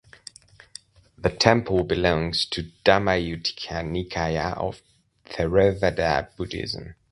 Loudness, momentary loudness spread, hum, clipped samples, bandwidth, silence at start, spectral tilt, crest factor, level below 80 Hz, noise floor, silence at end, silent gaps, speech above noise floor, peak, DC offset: -24 LUFS; 23 LU; none; under 0.1%; 11.5 kHz; 1.2 s; -5 dB/octave; 24 dB; -42 dBFS; -48 dBFS; 0.2 s; none; 25 dB; 0 dBFS; under 0.1%